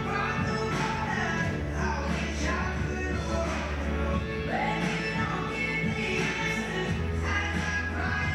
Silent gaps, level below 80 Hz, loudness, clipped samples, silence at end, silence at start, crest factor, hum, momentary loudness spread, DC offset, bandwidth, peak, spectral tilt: none; -38 dBFS; -29 LUFS; under 0.1%; 0 s; 0 s; 14 dB; none; 3 LU; under 0.1%; 12.5 kHz; -16 dBFS; -5.5 dB/octave